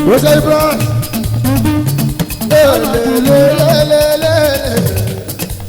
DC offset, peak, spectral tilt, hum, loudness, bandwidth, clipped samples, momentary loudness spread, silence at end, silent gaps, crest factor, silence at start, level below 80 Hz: under 0.1%; 0 dBFS; -5.5 dB/octave; none; -11 LUFS; over 20 kHz; under 0.1%; 8 LU; 0 s; none; 10 dB; 0 s; -30 dBFS